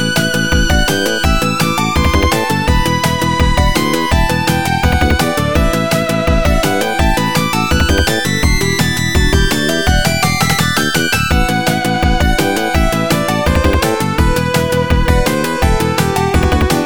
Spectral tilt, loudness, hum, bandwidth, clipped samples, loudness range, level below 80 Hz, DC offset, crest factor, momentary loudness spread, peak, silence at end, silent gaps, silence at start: -4.5 dB/octave; -13 LUFS; none; over 20 kHz; under 0.1%; 1 LU; -18 dBFS; 3%; 12 dB; 2 LU; 0 dBFS; 0 s; none; 0 s